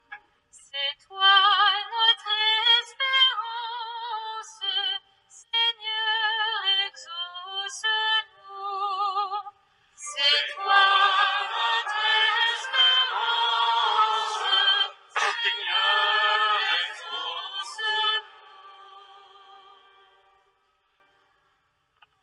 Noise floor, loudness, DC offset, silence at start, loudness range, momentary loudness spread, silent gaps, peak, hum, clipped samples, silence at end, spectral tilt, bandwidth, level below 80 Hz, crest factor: -70 dBFS; -23 LUFS; under 0.1%; 0.1 s; 8 LU; 14 LU; none; -6 dBFS; none; under 0.1%; 3.1 s; 3.5 dB/octave; 11 kHz; -86 dBFS; 18 dB